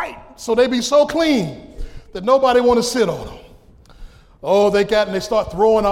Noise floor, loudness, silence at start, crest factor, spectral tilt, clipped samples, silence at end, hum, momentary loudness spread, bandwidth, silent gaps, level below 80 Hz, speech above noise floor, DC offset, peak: -45 dBFS; -16 LUFS; 0 s; 14 dB; -4.5 dB/octave; under 0.1%; 0 s; none; 18 LU; 16 kHz; none; -40 dBFS; 29 dB; under 0.1%; -2 dBFS